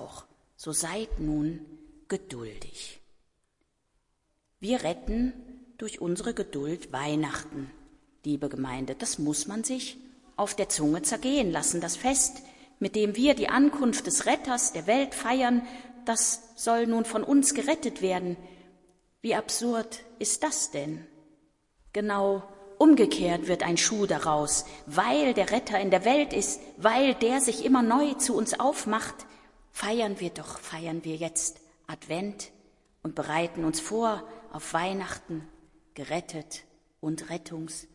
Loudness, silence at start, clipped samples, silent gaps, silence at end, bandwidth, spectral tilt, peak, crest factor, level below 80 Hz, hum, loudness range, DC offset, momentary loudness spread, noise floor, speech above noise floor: -27 LUFS; 0 s; under 0.1%; none; 0.1 s; 12 kHz; -3.5 dB/octave; -6 dBFS; 22 dB; -52 dBFS; none; 10 LU; under 0.1%; 17 LU; -75 dBFS; 48 dB